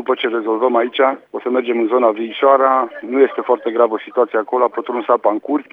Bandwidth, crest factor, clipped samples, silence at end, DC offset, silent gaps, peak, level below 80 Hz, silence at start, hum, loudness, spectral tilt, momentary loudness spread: 4 kHz; 16 dB; under 0.1%; 0.1 s; under 0.1%; none; 0 dBFS; -78 dBFS; 0 s; none; -16 LUFS; -7 dB/octave; 6 LU